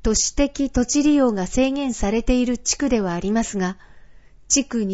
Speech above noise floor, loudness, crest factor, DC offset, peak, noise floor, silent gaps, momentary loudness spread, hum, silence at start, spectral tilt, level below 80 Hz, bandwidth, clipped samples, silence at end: 25 dB; -20 LUFS; 16 dB; under 0.1%; -4 dBFS; -45 dBFS; none; 6 LU; none; 0 s; -4 dB/octave; -34 dBFS; 8.2 kHz; under 0.1%; 0 s